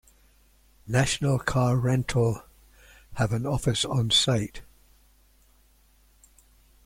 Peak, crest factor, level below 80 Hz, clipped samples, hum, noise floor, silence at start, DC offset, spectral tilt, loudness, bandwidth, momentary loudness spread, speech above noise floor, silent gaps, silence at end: -10 dBFS; 18 dB; -48 dBFS; under 0.1%; none; -60 dBFS; 0.85 s; under 0.1%; -4.5 dB/octave; -25 LUFS; 16 kHz; 8 LU; 36 dB; none; 2.25 s